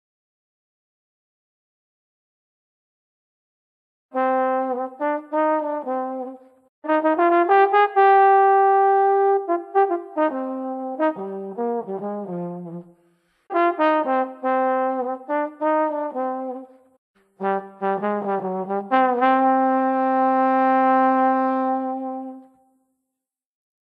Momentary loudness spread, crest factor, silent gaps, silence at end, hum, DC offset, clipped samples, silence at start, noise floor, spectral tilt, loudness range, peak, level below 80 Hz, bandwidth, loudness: 14 LU; 16 dB; 6.69-6.82 s, 16.98-17.14 s; 1.55 s; none; under 0.1%; under 0.1%; 4.15 s; -84 dBFS; -8.5 dB/octave; 10 LU; -6 dBFS; -80 dBFS; 5 kHz; -21 LUFS